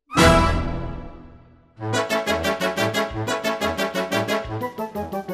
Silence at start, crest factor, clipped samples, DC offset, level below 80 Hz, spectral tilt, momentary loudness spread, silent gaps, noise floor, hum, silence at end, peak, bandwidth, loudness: 0.1 s; 22 dB; under 0.1%; under 0.1%; -34 dBFS; -4.5 dB/octave; 14 LU; none; -48 dBFS; none; 0 s; -2 dBFS; 15.5 kHz; -22 LUFS